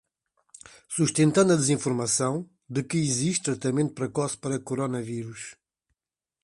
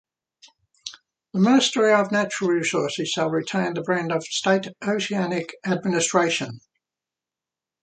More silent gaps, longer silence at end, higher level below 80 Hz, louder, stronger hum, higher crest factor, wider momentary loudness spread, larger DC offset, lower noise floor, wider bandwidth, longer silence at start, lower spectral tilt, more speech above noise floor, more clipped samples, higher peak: neither; second, 0.9 s vs 1.25 s; first, -64 dBFS vs -70 dBFS; second, -26 LUFS vs -22 LUFS; neither; about the same, 20 dB vs 20 dB; about the same, 13 LU vs 11 LU; neither; about the same, -90 dBFS vs -89 dBFS; first, 11.5 kHz vs 9.4 kHz; about the same, 0.9 s vs 0.85 s; about the same, -5 dB/octave vs -4 dB/octave; about the same, 64 dB vs 67 dB; neither; second, -8 dBFS vs -4 dBFS